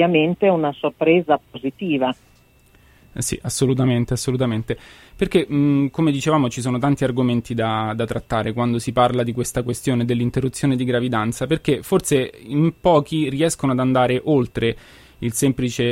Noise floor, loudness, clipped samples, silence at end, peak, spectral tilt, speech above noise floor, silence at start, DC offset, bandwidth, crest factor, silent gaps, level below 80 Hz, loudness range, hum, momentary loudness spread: -53 dBFS; -20 LUFS; under 0.1%; 0 s; -4 dBFS; -6 dB/octave; 34 dB; 0 s; under 0.1%; 16 kHz; 16 dB; none; -46 dBFS; 3 LU; none; 7 LU